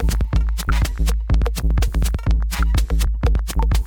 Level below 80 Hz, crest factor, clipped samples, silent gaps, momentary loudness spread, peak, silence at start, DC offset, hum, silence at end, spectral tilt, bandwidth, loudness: -18 dBFS; 12 dB; under 0.1%; none; 1 LU; -6 dBFS; 0 s; under 0.1%; none; 0 s; -5.5 dB/octave; 17.5 kHz; -21 LUFS